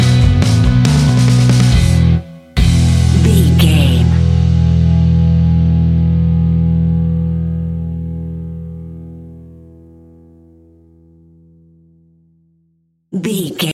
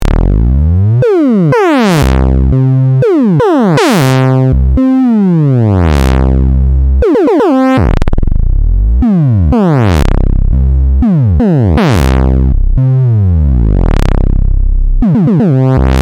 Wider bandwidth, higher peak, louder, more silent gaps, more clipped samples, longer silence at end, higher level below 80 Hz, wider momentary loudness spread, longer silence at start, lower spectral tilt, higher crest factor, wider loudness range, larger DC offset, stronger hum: second, 14 kHz vs 15.5 kHz; about the same, 0 dBFS vs 0 dBFS; second, -12 LUFS vs -9 LUFS; neither; neither; about the same, 0 s vs 0 s; second, -22 dBFS vs -12 dBFS; first, 15 LU vs 4 LU; about the same, 0 s vs 0 s; second, -6.5 dB/octave vs -8 dB/octave; about the same, 12 dB vs 8 dB; first, 17 LU vs 2 LU; neither; neither